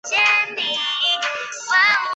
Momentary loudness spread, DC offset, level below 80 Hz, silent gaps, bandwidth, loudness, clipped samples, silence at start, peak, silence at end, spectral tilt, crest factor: 7 LU; under 0.1%; -68 dBFS; none; 8.4 kHz; -18 LUFS; under 0.1%; 0.05 s; -6 dBFS; 0 s; 1.5 dB/octave; 14 dB